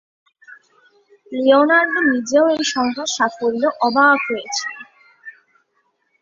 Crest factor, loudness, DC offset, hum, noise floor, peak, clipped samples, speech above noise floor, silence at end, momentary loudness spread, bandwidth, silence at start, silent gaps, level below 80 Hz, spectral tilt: 18 dB; -16 LUFS; under 0.1%; none; -66 dBFS; -2 dBFS; under 0.1%; 50 dB; 0.9 s; 11 LU; 7.8 kHz; 0.5 s; none; -66 dBFS; -2 dB/octave